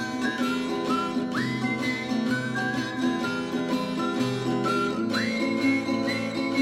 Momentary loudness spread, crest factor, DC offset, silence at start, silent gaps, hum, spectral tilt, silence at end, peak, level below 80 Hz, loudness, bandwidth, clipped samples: 3 LU; 14 dB; under 0.1%; 0 s; none; none; -5 dB/octave; 0 s; -12 dBFS; -62 dBFS; -27 LUFS; 13.5 kHz; under 0.1%